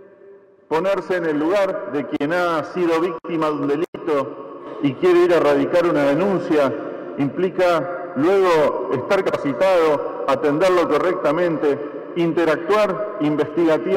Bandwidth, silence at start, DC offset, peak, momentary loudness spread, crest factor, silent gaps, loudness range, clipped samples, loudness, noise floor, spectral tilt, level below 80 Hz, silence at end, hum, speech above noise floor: 15 kHz; 0.25 s; under 0.1%; -8 dBFS; 8 LU; 10 dB; 3.88-3.93 s; 3 LU; under 0.1%; -19 LUFS; -46 dBFS; -6.5 dB/octave; -58 dBFS; 0 s; none; 28 dB